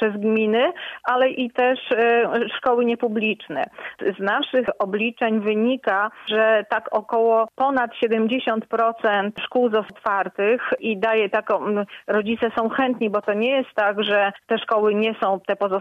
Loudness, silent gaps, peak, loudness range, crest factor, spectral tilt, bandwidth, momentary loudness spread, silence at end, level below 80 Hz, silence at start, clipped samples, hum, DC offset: -21 LUFS; none; -8 dBFS; 2 LU; 12 dB; -7 dB/octave; 5.4 kHz; 5 LU; 0 s; -68 dBFS; 0 s; under 0.1%; none; under 0.1%